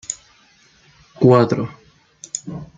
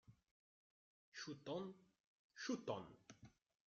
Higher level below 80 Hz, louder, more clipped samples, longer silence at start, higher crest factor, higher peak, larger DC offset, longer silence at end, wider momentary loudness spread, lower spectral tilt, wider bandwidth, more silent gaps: first, -56 dBFS vs -86 dBFS; first, -18 LUFS vs -50 LUFS; neither; about the same, 0.1 s vs 0.1 s; about the same, 20 dB vs 22 dB; first, -2 dBFS vs -32 dBFS; neither; second, 0.1 s vs 0.35 s; second, 17 LU vs 20 LU; first, -6.5 dB/octave vs -4 dB/octave; first, 9.6 kHz vs 7.6 kHz; second, none vs 0.31-1.12 s, 2.00-2.30 s